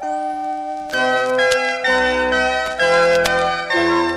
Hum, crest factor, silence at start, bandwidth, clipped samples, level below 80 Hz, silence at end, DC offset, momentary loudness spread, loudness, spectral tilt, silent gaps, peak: none; 16 dB; 0 s; 15 kHz; under 0.1%; -44 dBFS; 0 s; under 0.1%; 9 LU; -17 LUFS; -3 dB/octave; none; -2 dBFS